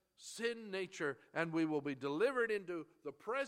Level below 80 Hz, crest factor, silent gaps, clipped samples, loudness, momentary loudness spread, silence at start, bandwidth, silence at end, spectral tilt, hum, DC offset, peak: -86 dBFS; 20 dB; none; under 0.1%; -40 LUFS; 11 LU; 0.2 s; 14 kHz; 0 s; -5 dB/octave; none; under 0.1%; -20 dBFS